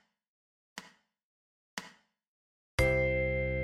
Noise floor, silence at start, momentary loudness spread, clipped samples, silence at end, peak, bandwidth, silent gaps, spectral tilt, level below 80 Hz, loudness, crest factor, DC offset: -58 dBFS; 0.75 s; 21 LU; under 0.1%; 0 s; -14 dBFS; 15.5 kHz; 1.23-1.77 s, 2.28-2.78 s; -5.5 dB/octave; -44 dBFS; -30 LUFS; 20 dB; under 0.1%